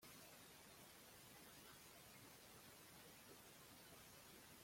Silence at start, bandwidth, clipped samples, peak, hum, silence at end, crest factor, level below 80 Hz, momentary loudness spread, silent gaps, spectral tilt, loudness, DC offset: 0 s; 16.5 kHz; under 0.1%; -48 dBFS; none; 0 s; 16 dB; -84 dBFS; 1 LU; none; -2.5 dB/octave; -62 LUFS; under 0.1%